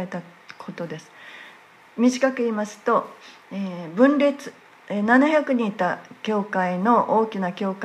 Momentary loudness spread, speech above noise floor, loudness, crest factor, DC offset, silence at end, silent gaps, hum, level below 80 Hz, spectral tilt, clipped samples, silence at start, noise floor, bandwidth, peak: 21 LU; 27 dB; -22 LUFS; 18 dB; under 0.1%; 0 s; none; none; -76 dBFS; -6 dB/octave; under 0.1%; 0 s; -49 dBFS; 11.5 kHz; -4 dBFS